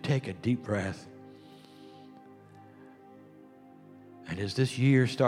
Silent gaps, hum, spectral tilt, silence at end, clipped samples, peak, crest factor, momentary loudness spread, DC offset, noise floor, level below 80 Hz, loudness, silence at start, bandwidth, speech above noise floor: none; none; -6.5 dB/octave; 0 s; under 0.1%; -12 dBFS; 20 dB; 28 LU; under 0.1%; -54 dBFS; -68 dBFS; -30 LUFS; 0 s; 11.5 kHz; 26 dB